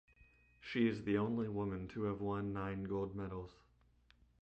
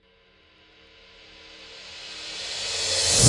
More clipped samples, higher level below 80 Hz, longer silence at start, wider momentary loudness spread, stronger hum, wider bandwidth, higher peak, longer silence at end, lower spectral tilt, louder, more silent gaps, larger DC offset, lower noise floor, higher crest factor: neither; second, -62 dBFS vs -48 dBFS; second, 0.6 s vs 1.4 s; second, 10 LU vs 25 LU; neither; second, 8.2 kHz vs 11.5 kHz; second, -22 dBFS vs -2 dBFS; first, 0.9 s vs 0 s; first, -8.5 dB/octave vs -2 dB/octave; second, -40 LUFS vs -26 LUFS; neither; neither; first, -70 dBFS vs -59 dBFS; second, 18 dB vs 24 dB